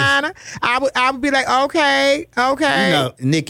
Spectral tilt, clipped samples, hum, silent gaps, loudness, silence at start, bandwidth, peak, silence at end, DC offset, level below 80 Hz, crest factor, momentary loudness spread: -4 dB/octave; under 0.1%; none; none; -16 LUFS; 0 s; 16.5 kHz; -4 dBFS; 0 s; under 0.1%; -52 dBFS; 14 dB; 4 LU